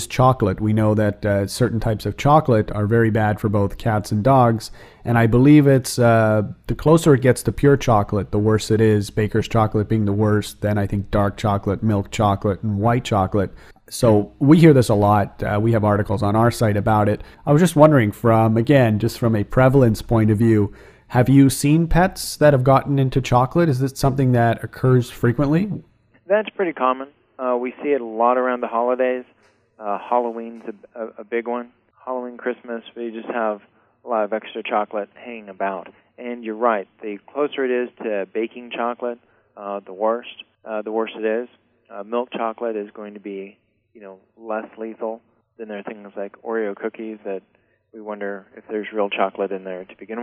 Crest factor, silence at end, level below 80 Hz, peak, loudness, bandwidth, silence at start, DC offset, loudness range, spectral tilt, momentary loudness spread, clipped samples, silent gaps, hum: 20 dB; 0 s; -40 dBFS; 0 dBFS; -19 LUFS; 15.5 kHz; 0 s; under 0.1%; 13 LU; -7 dB/octave; 18 LU; under 0.1%; none; none